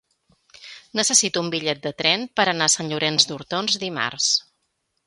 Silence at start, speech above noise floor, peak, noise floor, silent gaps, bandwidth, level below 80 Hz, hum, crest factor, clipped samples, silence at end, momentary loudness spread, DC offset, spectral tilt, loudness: 0.6 s; 51 dB; 0 dBFS; -73 dBFS; none; 11.5 kHz; -66 dBFS; none; 24 dB; under 0.1%; 0.65 s; 9 LU; under 0.1%; -1.5 dB/octave; -20 LUFS